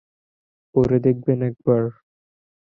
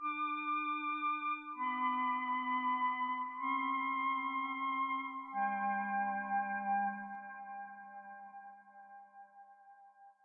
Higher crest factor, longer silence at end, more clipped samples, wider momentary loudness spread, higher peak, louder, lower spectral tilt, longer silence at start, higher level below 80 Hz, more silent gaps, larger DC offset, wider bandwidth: about the same, 18 dB vs 14 dB; first, 0.9 s vs 0.15 s; neither; second, 6 LU vs 18 LU; first, -4 dBFS vs -24 dBFS; first, -21 LUFS vs -37 LUFS; first, -11.5 dB/octave vs -1.5 dB/octave; first, 0.75 s vs 0 s; first, -52 dBFS vs under -90 dBFS; neither; neither; first, 5.2 kHz vs 3.8 kHz